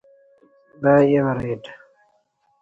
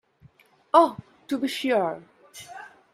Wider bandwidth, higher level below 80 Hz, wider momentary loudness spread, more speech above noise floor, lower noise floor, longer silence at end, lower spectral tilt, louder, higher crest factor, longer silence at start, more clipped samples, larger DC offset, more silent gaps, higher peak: second, 7.8 kHz vs 15 kHz; first, -54 dBFS vs -70 dBFS; second, 16 LU vs 24 LU; first, 47 dB vs 35 dB; first, -65 dBFS vs -57 dBFS; first, 0.85 s vs 0.25 s; first, -9 dB/octave vs -4.5 dB/octave; first, -19 LUFS vs -24 LUFS; second, 18 dB vs 24 dB; about the same, 0.8 s vs 0.75 s; neither; neither; neither; about the same, -4 dBFS vs -4 dBFS